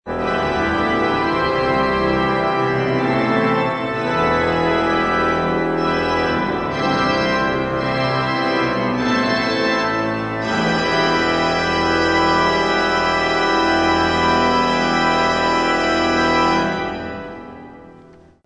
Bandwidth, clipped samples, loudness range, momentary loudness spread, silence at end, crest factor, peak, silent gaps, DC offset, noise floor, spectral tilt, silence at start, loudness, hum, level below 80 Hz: 10 kHz; under 0.1%; 2 LU; 5 LU; 0.45 s; 14 dB; -4 dBFS; none; under 0.1%; -45 dBFS; -5 dB/octave; 0.05 s; -17 LUFS; none; -40 dBFS